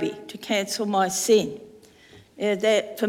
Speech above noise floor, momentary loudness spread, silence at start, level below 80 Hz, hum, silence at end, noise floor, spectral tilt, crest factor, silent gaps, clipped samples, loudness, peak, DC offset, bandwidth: 28 dB; 13 LU; 0 s; -68 dBFS; none; 0 s; -52 dBFS; -3 dB/octave; 18 dB; none; under 0.1%; -23 LUFS; -8 dBFS; under 0.1%; 17 kHz